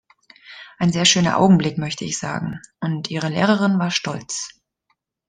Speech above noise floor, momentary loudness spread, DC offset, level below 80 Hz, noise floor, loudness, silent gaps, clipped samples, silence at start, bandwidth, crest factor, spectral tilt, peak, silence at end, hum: 51 dB; 13 LU; under 0.1%; -56 dBFS; -70 dBFS; -19 LUFS; none; under 0.1%; 0.5 s; 9.8 kHz; 20 dB; -4.5 dB/octave; -2 dBFS; 0.8 s; none